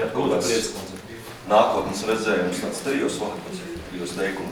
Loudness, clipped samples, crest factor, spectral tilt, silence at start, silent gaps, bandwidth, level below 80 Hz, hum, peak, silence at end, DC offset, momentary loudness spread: -24 LUFS; under 0.1%; 20 dB; -4 dB/octave; 0 s; none; 19.5 kHz; -52 dBFS; none; -4 dBFS; 0 s; under 0.1%; 15 LU